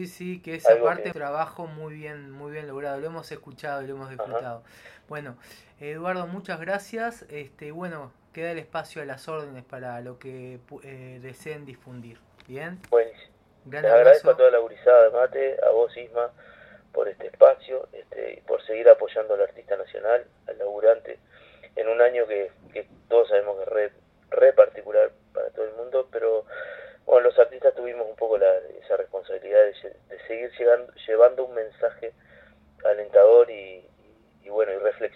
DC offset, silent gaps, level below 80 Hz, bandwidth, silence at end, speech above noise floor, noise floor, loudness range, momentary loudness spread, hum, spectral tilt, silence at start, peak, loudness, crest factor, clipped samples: under 0.1%; none; -68 dBFS; 10.5 kHz; 0.1 s; 35 dB; -58 dBFS; 16 LU; 23 LU; none; -6 dB/octave; 0 s; 0 dBFS; -22 LUFS; 22 dB; under 0.1%